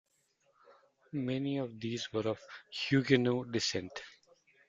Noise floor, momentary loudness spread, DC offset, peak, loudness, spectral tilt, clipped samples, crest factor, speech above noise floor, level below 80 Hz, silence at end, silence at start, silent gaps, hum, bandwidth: -75 dBFS; 15 LU; under 0.1%; -12 dBFS; -34 LUFS; -5 dB/octave; under 0.1%; 24 dB; 41 dB; -72 dBFS; 0.6 s; 1.15 s; none; none; 7.8 kHz